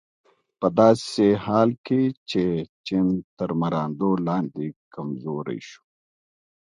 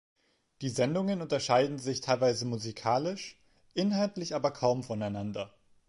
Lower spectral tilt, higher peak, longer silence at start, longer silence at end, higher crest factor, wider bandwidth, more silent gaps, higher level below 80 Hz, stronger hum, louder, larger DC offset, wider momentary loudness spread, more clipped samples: first, -7 dB/octave vs -5.5 dB/octave; first, -2 dBFS vs -12 dBFS; about the same, 0.6 s vs 0.6 s; first, 0.95 s vs 0.4 s; about the same, 22 dB vs 20 dB; about the same, 11 kHz vs 11.5 kHz; first, 1.78-1.84 s, 2.17-2.26 s, 2.69-2.84 s, 3.24-3.37 s, 4.76-4.91 s vs none; first, -58 dBFS vs -68 dBFS; neither; first, -23 LUFS vs -31 LUFS; neither; first, 15 LU vs 11 LU; neither